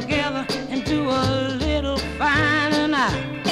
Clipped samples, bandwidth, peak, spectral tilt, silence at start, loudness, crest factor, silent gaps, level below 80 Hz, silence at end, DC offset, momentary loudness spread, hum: under 0.1%; 14.5 kHz; -8 dBFS; -5 dB/octave; 0 s; -21 LUFS; 14 dB; none; -36 dBFS; 0 s; under 0.1%; 7 LU; none